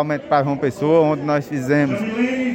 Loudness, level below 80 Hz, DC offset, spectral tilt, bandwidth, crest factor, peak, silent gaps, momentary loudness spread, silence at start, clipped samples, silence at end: -19 LUFS; -58 dBFS; under 0.1%; -7.5 dB/octave; 16.5 kHz; 14 dB; -4 dBFS; none; 5 LU; 0 s; under 0.1%; 0 s